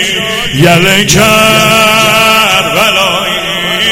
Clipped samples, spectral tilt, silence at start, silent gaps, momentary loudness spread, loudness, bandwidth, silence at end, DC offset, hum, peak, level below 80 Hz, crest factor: 2%; -3 dB/octave; 0 s; none; 6 LU; -6 LUFS; over 20 kHz; 0 s; under 0.1%; none; 0 dBFS; -34 dBFS; 8 dB